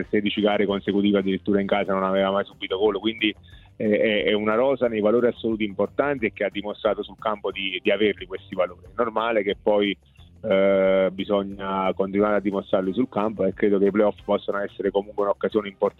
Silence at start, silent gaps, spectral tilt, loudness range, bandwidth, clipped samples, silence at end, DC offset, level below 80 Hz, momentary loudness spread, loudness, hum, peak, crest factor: 0 s; none; -8 dB/octave; 3 LU; 4.2 kHz; under 0.1%; 0.1 s; under 0.1%; -54 dBFS; 7 LU; -23 LUFS; none; -8 dBFS; 16 dB